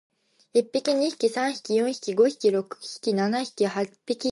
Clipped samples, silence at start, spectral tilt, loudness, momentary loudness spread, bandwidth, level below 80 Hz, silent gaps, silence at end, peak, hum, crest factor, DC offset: under 0.1%; 0.55 s; -4.5 dB/octave; -25 LUFS; 7 LU; 11.5 kHz; -78 dBFS; none; 0 s; -8 dBFS; none; 16 dB; under 0.1%